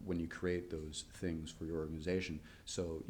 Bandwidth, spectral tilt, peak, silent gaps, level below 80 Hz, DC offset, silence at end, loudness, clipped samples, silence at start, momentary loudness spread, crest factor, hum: 19.5 kHz; -5 dB/octave; -24 dBFS; none; -56 dBFS; under 0.1%; 0 s; -42 LUFS; under 0.1%; 0 s; 6 LU; 18 dB; none